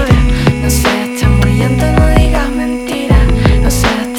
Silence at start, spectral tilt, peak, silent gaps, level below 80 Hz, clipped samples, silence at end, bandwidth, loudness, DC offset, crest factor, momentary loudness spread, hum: 0 s; -5.5 dB/octave; 0 dBFS; none; -14 dBFS; under 0.1%; 0 s; 18 kHz; -11 LUFS; under 0.1%; 10 dB; 5 LU; none